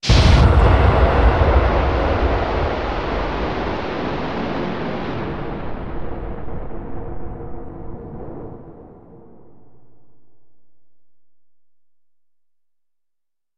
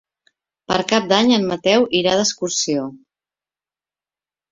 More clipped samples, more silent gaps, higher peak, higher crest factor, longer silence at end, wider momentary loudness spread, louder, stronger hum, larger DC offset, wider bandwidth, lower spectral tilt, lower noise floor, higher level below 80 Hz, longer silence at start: neither; neither; about the same, -2 dBFS vs -2 dBFS; about the same, 18 dB vs 20 dB; second, 0 s vs 1.55 s; first, 20 LU vs 7 LU; about the same, -19 LUFS vs -17 LUFS; neither; first, 1% vs under 0.1%; first, 9 kHz vs 7.8 kHz; first, -6.5 dB/octave vs -3.5 dB/octave; second, -81 dBFS vs under -90 dBFS; first, -24 dBFS vs -58 dBFS; second, 0 s vs 0.7 s